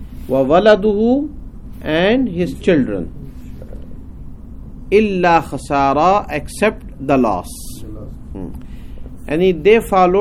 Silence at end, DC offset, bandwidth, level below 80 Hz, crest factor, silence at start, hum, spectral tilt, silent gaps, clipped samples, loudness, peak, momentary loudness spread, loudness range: 0 s; under 0.1%; 15 kHz; -34 dBFS; 16 dB; 0 s; none; -6.5 dB/octave; none; under 0.1%; -15 LUFS; 0 dBFS; 24 LU; 4 LU